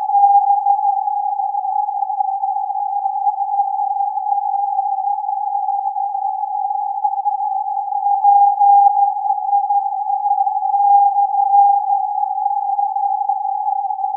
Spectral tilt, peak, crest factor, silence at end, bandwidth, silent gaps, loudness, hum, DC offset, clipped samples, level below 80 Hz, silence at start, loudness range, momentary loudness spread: -4 dB/octave; -2 dBFS; 14 dB; 0 s; 1 kHz; none; -17 LUFS; none; under 0.1%; under 0.1%; under -90 dBFS; 0 s; 5 LU; 8 LU